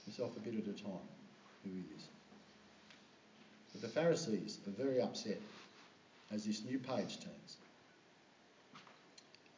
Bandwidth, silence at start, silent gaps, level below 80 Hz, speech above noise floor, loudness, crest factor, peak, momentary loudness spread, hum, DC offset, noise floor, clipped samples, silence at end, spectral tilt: 7.6 kHz; 0 s; none; -86 dBFS; 25 dB; -42 LUFS; 22 dB; -24 dBFS; 24 LU; none; under 0.1%; -67 dBFS; under 0.1%; 0 s; -5 dB/octave